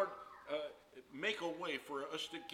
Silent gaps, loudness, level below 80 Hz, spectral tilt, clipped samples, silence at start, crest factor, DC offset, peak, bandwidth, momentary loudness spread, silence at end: none; -42 LUFS; -80 dBFS; -3 dB/octave; under 0.1%; 0 s; 18 dB; under 0.1%; -24 dBFS; 17 kHz; 13 LU; 0 s